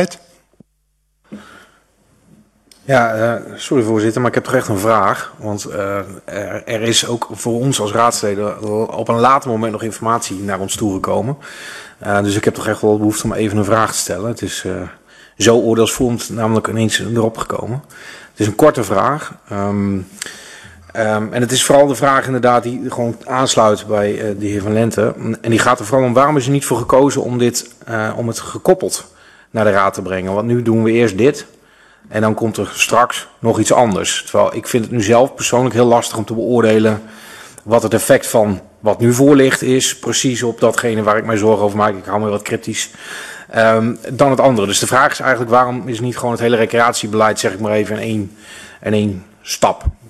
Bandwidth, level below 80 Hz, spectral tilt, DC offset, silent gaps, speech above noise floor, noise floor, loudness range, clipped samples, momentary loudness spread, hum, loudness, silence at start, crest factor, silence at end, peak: 14 kHz; -42 dBFS; -4.5 dB/octave; under 0.1%; none; 48 dB; -63 dBFS; 4 LU; under 0.1%; 12 LU; none; -15 LUFS; 0 s; 16 dB; 0.15 s; 0 dBFS